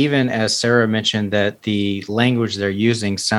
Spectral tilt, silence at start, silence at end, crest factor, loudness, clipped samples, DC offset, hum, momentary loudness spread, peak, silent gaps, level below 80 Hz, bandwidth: -4.5 dB/octave; 0 s; 0 s; 16 dB; -18 LUFS; under 0.1%; under 0.1%; none; 5 LU; -2 dBFS; none; -60 dBFS; 12.5 kHz